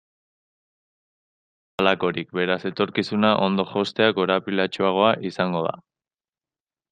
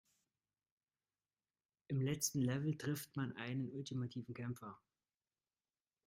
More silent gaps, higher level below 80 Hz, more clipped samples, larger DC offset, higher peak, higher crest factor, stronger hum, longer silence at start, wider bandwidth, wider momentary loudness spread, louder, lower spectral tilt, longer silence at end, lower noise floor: neither; first, -66 dBFS vs -78 dBFS; neither; neither; first, -2 dBFS vs -22 dBFS; about the same, 22 dB vs 22 dB; neither; about the same, 1.8 s vs 1.9 s; second, 9.2 kHz vs 16 kHz; second, 6 LU vs 9 LU; first, -22 LUFS vs -42 LUFS; first, -6.5 dB/octave vs -5 dB/octave; second, 1.1 s vs 1.3 s; about the same, under -90 dBFS vs under -90 dBFS